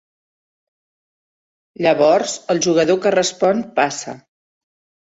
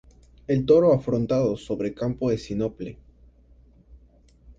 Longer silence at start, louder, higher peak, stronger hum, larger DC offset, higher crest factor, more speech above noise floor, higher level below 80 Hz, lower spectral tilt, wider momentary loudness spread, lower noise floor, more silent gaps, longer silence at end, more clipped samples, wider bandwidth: first, 1.8 s vs 0.5 s; first, -17 LUFS vs -23 LUFS; first, -2 dBFS vs -6 dBFS; neither; neither; about the same, 18 dB vs 18 dB; first, over 74 dB vs 33 dB; second, -64 dBFS vs -50 dBFS; second, -4 dB/octave vs -8.5 dB/octave; second, 6 LU vs 15 LU; first, under -90 dBFS vs -55 dBFS; neither; first, 0.85 s vs 0.05 s; neither; about the same, 8 kHz vs 7.8 kHz